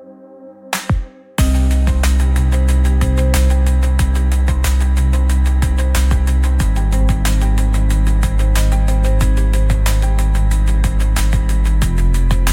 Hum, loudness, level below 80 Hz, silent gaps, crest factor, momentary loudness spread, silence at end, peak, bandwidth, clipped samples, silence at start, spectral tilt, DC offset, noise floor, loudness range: none; -16 LUFS; -14 dBFS; none; 12 dB; 2 LU; 0 s; -2 dBFS; 16.5 kHz; under 0.1%; 0 s; -5.5 dB/octave; under 0.1%; -38 dBFS; 1 LU